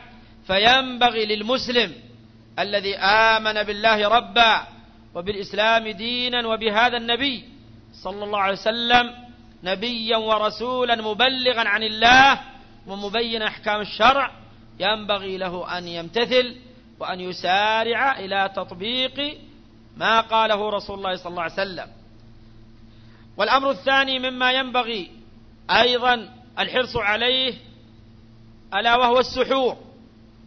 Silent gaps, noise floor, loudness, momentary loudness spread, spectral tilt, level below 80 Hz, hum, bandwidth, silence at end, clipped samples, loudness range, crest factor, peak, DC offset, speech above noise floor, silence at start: none; -48 dBFS; -20 LUFS; 13 LU; -3.5 dB/octave; -50 dBFS; none; 6.6 kHz; 0.65 s; under 0.1%; 5 LU; 22 dB; 0 dBFS; under 0.1%; 27 dB; 0 s